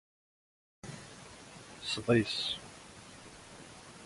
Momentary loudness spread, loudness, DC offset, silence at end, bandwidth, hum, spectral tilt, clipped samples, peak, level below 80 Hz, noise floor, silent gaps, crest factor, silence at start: 22 LU; -33 LUFS; under 0.1%; 0 s; 11.5 kHz; none; -4.5 dB/octave; under 0.1%; -14 dBFS; -64 dBFS; -52 dBFS; none; 24 dB; 0.85 s